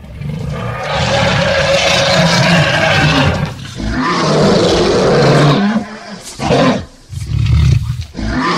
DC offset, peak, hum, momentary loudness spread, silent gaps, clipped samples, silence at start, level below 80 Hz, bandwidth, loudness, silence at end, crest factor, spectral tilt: under 0.1%; 0 dBFS; none; 12 LU; none; under 0.1%; 0 s; -26 dBFS; 14 kHz; -12 LUFS; 0 s; 12 dB; -5 dB/octave